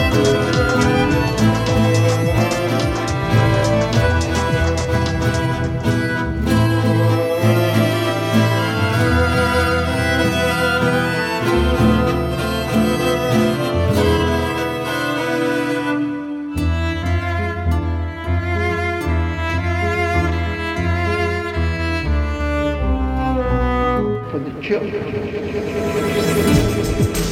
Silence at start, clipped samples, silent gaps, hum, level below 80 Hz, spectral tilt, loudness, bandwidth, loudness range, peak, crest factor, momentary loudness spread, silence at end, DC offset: 0 s; under 0.1%; none; none; -28 dBFS; -6 dB/octave; -18 LUFS; 16 kHz; 4 LU; -2 dBFS; 14 dB; 6 LU; 0 s; under 0.1%